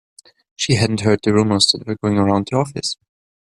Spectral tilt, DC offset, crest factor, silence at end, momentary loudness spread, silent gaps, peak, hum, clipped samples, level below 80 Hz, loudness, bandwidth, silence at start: -5 dB/octave; under 0.1%; 18 dB; 0.55 s; 10 LU; none; -2 dBFS; none; under 0.1%; -52 dBFS; -17 LUFS; 12 kHz; 0.6 s